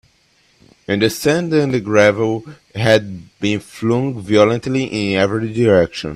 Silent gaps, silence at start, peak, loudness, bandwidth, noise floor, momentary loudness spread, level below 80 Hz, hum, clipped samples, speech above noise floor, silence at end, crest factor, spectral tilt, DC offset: none; 0.9 s; 0 dBFS; -16 LUFS; 14.5 kHz; -57 dBFS; 8 LU; -50 dBFS; none; under 0.1%; 41 dB; 0 s; 16 dB; -6 dB/octave; under 0.1%